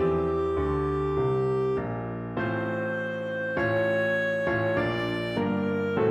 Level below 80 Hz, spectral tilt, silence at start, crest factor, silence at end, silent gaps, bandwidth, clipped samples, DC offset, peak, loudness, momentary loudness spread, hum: -46 dBFS; -8 dB/octave; 0 s; 14 dB; 0 s; none; 8.8 kHz; under 0.1%; under 0.1%; -12 dBFS; -27 LUFS; 5 LU; none